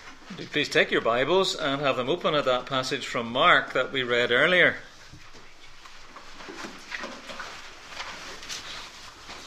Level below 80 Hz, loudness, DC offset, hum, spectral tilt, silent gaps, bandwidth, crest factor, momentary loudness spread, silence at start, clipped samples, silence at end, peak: -52 dBFS; -24 LUFS; under 0.1%; none; -3.5 dB/octave; none; 15.5 kHz; 22 dB; 22 LU; 0 s; under 0.1%; 0 s; -6 dBFS